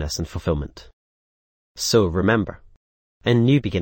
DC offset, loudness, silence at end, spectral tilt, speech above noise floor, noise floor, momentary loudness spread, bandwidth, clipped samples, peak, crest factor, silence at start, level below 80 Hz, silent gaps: under 0.1%; -21 LUFS; 0 s; -5.5 dB/octave; over 70 dB; under -90 dBFS; 10 LU; 17 kHz; under 0.1%; -4 dBFS; 18 dB; 0 s; -40 dBFS; 0.93-1.75 s, 2.76-3.21 s